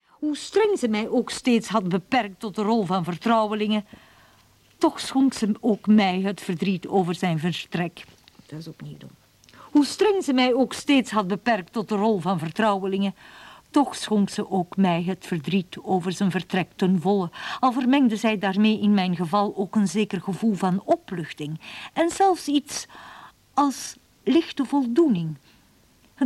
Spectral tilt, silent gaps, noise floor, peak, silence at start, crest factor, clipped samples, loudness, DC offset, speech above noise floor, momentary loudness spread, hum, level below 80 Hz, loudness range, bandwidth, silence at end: -5.5 dB/octave; none; -58 dBFS; -6 dBFS; 0.2 s; 18 dB; under 0.1%; -23 LUFS; under 0.1%; 35 dB; 11 LU; none; -64 dBFS; 3 LU; 13.5 kHz; 0 s